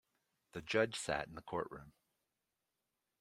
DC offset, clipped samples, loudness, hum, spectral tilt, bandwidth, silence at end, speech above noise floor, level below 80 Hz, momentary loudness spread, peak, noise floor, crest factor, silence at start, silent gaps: under 0.1%; under 0.1%; -39 LUFS; none; -4 dB/octave; 16 kHz; 1.3 s; 49 dB; -70 dBFS; 16 LU; -18 dBFS; -89 dBFS; 26 dB; 0.55 s; none